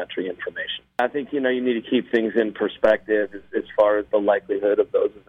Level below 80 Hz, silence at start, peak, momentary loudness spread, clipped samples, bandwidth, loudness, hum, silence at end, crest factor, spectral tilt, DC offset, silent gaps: -60 dBFS; 0 s; -6 dBFS; 9 LU; under 0.1%; 5.2 kHz; -22 LUFS; none; 0.1 s; 16 dB; -6.5 dB/octave; under 0.1%; none